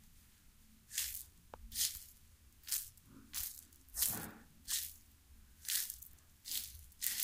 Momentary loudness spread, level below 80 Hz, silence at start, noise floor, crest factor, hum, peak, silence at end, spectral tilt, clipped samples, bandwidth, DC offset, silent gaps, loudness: 18 LU; -64 dBFS; 0 s; -64 dBFS; 32 dB; none; -14 dBFS; 0 s; 0.5 dB/octave; under 0.1%; 16.5 kHz; under 0.1%; none; -40 LUFS